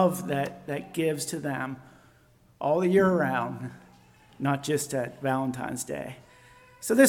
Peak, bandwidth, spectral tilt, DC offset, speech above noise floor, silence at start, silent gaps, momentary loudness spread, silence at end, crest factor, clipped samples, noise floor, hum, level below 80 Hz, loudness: -6 dBFS; 18 kHz; -5.5 dB/octave; under 0.1%; 33 dB; 0 s; none; 15 LU; 0 s; 22 dB; under 0.1%; -60 dBFS; none; -64 dBFS; -28 LUFS